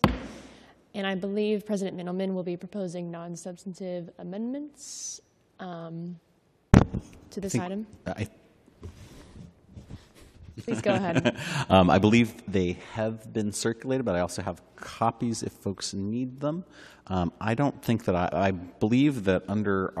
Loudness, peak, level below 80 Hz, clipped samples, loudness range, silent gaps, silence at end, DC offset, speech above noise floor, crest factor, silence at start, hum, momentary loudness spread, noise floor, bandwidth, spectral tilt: -28 LUFS; 0 dBFS; -46 dBFS; under 0.1%; 12 LU; none; 0 s; under 0.1%; 25 dB; 28 dB; 0.05 s; none; 21 LU; -53 dBFS; 14 kHz; -6 dB/octave